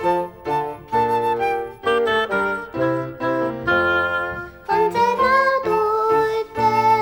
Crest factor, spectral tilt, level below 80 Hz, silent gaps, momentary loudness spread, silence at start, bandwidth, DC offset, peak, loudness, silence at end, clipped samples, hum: 14 dB; -5.5 dB/octave; -50 dBFS; none; 8 LU; 0 s; 16.5 kHz; under 0.1%; -6 dBFS; -20 LUFS; 0 s; under 0.1%; none